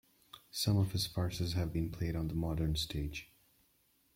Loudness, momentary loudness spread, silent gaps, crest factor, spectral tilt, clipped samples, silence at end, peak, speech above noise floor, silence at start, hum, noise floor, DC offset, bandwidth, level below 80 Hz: -36 LUFS; 12 LU; none; 16 dB; -5.5 dB/octave; under 0.1%; 0.9 s; -22 dBFS; 38 dB; 0.35 s; none; -73 dBFS; under 0.1%; 16.5 kHz; -50 dBFS